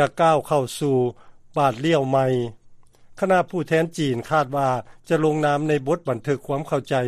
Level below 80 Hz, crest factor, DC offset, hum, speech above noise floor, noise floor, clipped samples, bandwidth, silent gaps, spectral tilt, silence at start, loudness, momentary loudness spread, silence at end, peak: -56 dBFS; 18 dB; under 0.1%; none; 26 dB; -47 dBFS; under 0.1%; 14.5 kHz; none; -6.5 dB/octave; 0 s; -22 LUFS; 6 LU; 0 s; -4 dBFS